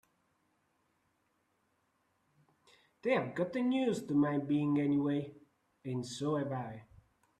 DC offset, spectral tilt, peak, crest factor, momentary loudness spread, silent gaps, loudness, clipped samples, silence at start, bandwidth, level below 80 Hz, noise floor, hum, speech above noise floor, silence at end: under 0.1%; -7 dB/octave; -18 dBFS; 18 dB; 11 LU; none; -34 LUFS; under 0.1%; 3.05 s; 11 kHz; -76 dBFS; -78 dBFS; none; 44 dB; 0.55 s